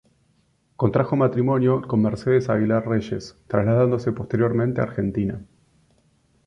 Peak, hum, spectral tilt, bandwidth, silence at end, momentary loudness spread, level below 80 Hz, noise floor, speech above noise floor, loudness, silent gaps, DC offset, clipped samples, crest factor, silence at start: -4 dBFS; none; -9 dB/octave; 7.4 kHz; 1.05 s; 7 LU; -50 dBFS; -64 dBFS; 43 dB; -22 LUFS; none; under 0.1%; under 0.1%; 18 dB; 0.8 s